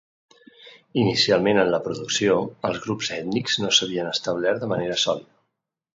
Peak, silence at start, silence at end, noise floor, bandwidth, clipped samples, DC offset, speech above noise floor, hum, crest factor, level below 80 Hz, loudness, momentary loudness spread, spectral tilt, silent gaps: -4 dBFS; 0.6 s; 0.75 s; -79 dBFS; 7.8 kHz; under 0.1%; under 0.1%; 56 dB; none; 20 dB; -60 dBFS; -22 LUFS; 8 LU; -3.5 dB/octave; none